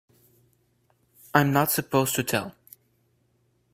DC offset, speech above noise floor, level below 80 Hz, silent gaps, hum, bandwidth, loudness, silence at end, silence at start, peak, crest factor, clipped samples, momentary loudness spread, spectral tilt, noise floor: under 0.1%; 45 dB; -62 dBFS; none; none; 16.5 kHz; -24 LUFS; 1.25 s; 1.35 s; -2 dBFS; 26 dB; under 0.1%; 7 LU; -4.5 dB/octave; -68 dBFS